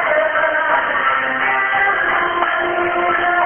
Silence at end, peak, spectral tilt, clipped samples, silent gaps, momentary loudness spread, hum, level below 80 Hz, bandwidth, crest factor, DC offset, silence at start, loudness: 0 s; -2 dBFS; -8.5 dB/octave; under 0.1%; none; 2 LU; none; -50 dBFS; 3.5 kHz; 14 dB; under 0.1%; 0 s; -16 LUFS